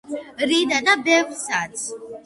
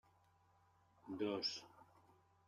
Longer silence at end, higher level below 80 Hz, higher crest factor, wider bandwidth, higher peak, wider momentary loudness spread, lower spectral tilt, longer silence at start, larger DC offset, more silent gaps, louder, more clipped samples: second, 0.05 s vs 0.65 s; first, -64 dBFS vs -88 dBFS; about the same, 18 dB vs 20 dB; second, 11.5 kHz vs 13.5 kHz; first, -4 dBFS vs -30 dBFS; second, 13 LU vs 23 LU; second, -1.5 dB/octave vs -4 dB/octave; second, 0.05 s vs 1.05 s; neither; neither; first, -20 LUFS vs -44 LUFS; neither